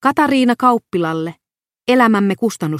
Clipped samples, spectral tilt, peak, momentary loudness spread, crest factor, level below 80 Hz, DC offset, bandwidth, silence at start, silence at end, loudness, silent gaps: under 0.1%; -6 dB/octave; 0 dBFS; 11 LU; 16 dB; -62 dBFS; under 0.1%; 15.5 kHz; 0 s; 0 s; -15 LUFS; none